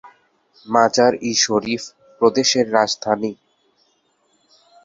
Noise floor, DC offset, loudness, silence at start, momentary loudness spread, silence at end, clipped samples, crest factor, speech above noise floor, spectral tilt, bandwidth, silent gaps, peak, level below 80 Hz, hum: -64 dBFS; under 0.1%; -18 LUFS; 0.05 s; 11 LU; 1.5 s; under 0.1%; 18 dB; 46 dB; -2.5 dB/octave; 7.8 kHz; none; -2 dBFS; -62 dBFS; none